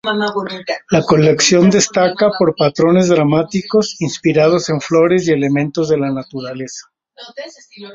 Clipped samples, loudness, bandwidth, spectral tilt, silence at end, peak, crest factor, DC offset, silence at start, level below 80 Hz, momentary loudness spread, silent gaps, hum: under 0.1%; -14 LUFS; 8 kHz; -5 dB/octave; 0 s; 0 dBFS; 14 dB; under 0.1%; 0.05 s; -50 dBFS; 16 LU; none; none